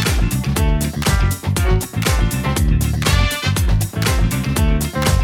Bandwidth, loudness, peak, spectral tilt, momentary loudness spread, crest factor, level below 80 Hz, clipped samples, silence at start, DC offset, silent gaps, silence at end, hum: 18.5 kHz; -18 LUFS; -2 dBFS; -5 dB/octave; 2 LU; 14 dB; -20 dBFS; under 0.1%; 0 s; under 0.1%; none; 0 s; none